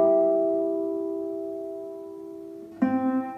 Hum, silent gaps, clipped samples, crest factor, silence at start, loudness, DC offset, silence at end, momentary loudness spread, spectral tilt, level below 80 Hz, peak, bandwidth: none; none; under 0.1%; 16 dB; 0 s; -27 LUFS; under 0.1%; 0 s; 18 LU; -9 dB/octave; -74 dBFS; -12 dBFS; 5.6 kHz